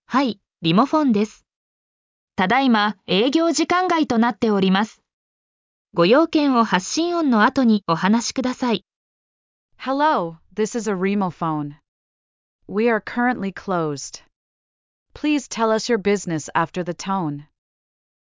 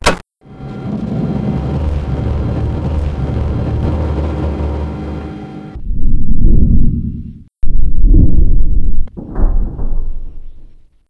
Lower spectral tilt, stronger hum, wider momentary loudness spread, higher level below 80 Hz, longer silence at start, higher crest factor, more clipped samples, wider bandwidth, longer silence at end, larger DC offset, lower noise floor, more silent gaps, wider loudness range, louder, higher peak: second, -5 dB/octave vs -7 dB/octave; neither; second, 11 LU vs 14 LU; second, -60 dBFS vs -14 dBFS; about the same, 0.1 s vs 0.05 s; first, 18 dB vs 10 dB; neither; second, 7.6 kHz vs 8.8 kHz; first, 0.85 s vs 0.45 s; neither; first, under -90 dBFS vs -37 dBFS; first, 1.56-2.28 s, 5.13-5.85 s, 8.96-9.69 s, 11.88-12.59 s, 14.36-15.06 s vs none; first, 6 LU vs 3 LU; about the same, -20 LUFS vs -18 LUFS; second, -4 dBFS vs 0 dBFS